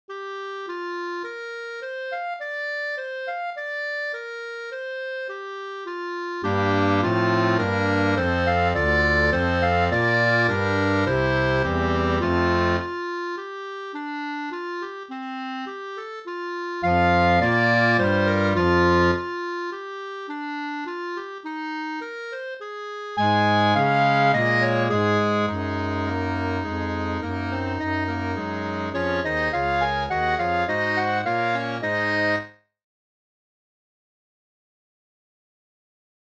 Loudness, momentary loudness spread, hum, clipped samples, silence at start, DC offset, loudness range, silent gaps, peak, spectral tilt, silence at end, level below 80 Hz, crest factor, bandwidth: -23 LUFS; 14 LU; none; under 0.1%; 0.1 s; under 0.1%; 10 LU; none; -8 dBFS; -6.5 dB/octave; 3.85 s; -44 dBFS; 16 dB; 8.4 kHz